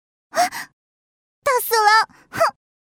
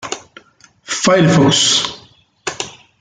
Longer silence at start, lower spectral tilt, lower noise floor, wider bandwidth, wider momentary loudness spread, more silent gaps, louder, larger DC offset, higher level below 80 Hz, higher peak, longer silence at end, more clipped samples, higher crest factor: first, 0.35 s vs 0 s; second, -0.5 dB/octave vs -3.5 dB/octave; first, under -90 dBFS vs -49 dBFS; first, over 20 kHz vs 9.6 kHz; second, 13 LU vs 17 LU; first, 0.73-1.42 s vs none; second, -19 LUFS vs -13 LUFS; neither; second, -64 dBFS vs -52 dBFS; about the same, -2 dBFS vs -2 dBFS; first, 0.45 s vs 0.3 s; neither; about the same, 20 dB vs 16 dB